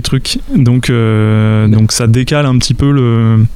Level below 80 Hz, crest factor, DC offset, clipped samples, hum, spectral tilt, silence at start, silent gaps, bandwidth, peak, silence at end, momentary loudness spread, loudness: -26 dBFS; 8 dB; under 0.1%; under 0.1%; none; -6 dB/octave; 0 s; none; 14 kHz; 0 dBFS; 0 s; 2 LU; -10 LUFS